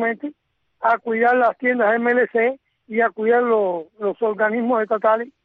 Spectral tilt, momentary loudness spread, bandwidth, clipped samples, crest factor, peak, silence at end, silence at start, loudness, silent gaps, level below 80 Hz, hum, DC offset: -8 dB/octave; 9 LU; 4.4 kHz; under 0.1%; 14 dB; -6 dBFS; 0.15 s; 0 s; -19 LUFS; none; -70 dBFS; none; under 0.1%